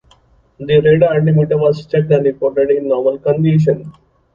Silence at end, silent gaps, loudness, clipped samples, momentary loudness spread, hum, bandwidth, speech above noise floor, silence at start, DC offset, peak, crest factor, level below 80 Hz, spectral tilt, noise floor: 0.45 s; none; -14 LUFS; under 0.1%; 5 LU; none; 7 kHz; 38 dB; 0.6 s; under 0.1%; 0 dBFS; 14 dB; -48 dBFS; -9.5 dB/octave; -51 dBFS